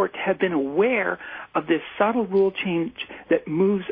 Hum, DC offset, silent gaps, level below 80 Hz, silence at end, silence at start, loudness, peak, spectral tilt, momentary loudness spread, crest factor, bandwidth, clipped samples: none; under 0.1%; none; -62 dBFS; 0 s; 0 s; -23 LUFS; -8 dBFS; -10 dB/octave; 8 LU; 14 dB; 4.9 kHz; under 0.1%